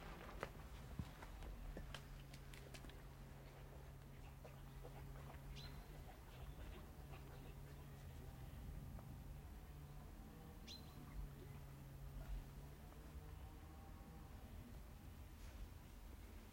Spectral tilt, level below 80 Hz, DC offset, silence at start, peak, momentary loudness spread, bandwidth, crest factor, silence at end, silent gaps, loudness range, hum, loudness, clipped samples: -5.5 dB/octave; -58 dBFS; under 0.1%; 0 s; -30 dBFS; 5 LU; 16.5 kHz; 26 dB; 0 s; none; 2 LU; none; -58 LUFS; under 0.1%